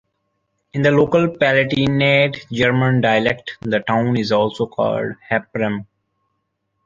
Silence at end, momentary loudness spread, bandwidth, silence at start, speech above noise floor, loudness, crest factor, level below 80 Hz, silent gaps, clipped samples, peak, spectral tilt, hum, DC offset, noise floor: 1.05 s; 8 LU; 7.6 kHz; 0.75 s; 55 dB; -17 LUFS; 16 dB; -52 dBFS; none; under 0.1%; -2 dBFS; -7 dB/octave; none; under 0.1%; -72 dBFS